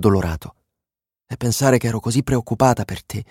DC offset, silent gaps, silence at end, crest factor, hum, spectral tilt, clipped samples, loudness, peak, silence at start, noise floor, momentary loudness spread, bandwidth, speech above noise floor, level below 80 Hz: under 0.1%; none; 0.05 s; 18 dB; none; -6 dB/octave; under 0.1%; -20 LUFS; -2 dBFS; 0 s; -88 dBFS; 12 LU; 16.5 kHz; 69 dB; -40 dBFS